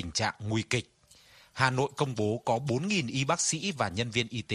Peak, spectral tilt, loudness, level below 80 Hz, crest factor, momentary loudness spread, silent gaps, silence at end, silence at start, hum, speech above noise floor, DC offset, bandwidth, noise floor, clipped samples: -8 dBFS; -4 dB/octave; -30 LUFS; -60 dBFS; 24 dB; 4 LU; none; 0 s; 0 s; none; 29 dB; under 0.1%; 13.5 kHz; -58 dBFS; under 0.1%